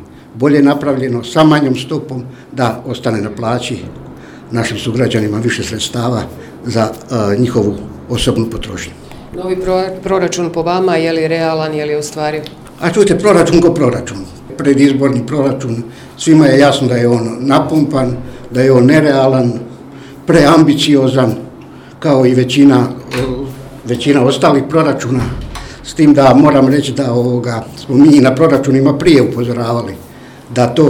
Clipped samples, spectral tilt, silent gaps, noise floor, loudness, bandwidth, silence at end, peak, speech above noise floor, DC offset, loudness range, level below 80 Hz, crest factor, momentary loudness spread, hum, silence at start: 0.8%; -6 dB/octave; none; -33 dBFS; -12 LUFS; 15.5 kHz; 0 s; 0 dBFS; 22 dB; under 0.1%; 7 LU; -38 dBFS; 12 dB; 17 LU; none; 0 s